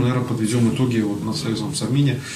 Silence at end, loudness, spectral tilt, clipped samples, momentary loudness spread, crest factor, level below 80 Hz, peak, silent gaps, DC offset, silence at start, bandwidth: 0 s; -21 LUFS; -6 dB/octave; under 0.1%; 5 LU; 14 dB; -52 dBFS; -8 dBFS; none; under 0.1%; 0 s; 14.5 kHz